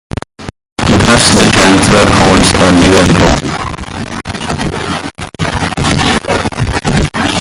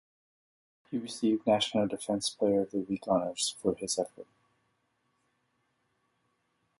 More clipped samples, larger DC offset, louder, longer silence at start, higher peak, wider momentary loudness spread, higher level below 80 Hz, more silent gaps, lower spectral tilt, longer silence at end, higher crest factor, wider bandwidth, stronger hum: first, 0.2% vs under 0.1%; neither; first, -9 LUFS vs -31 LUFS; second, 0.4 s vs 0.9 s; first, 0 dBFS vs -14 dBFS; first, 15 LU vs 9 LU; first, -24 dBFS vs -68 dBFS; first, 0.72-0.76 s vs none; about the same, -4 dB/octave vs -4 dB/octave; second, 0 s vs 2.55 s; second, 10 dB vs 20 dB; first, 16 kHz vs 11.5 kHz; neither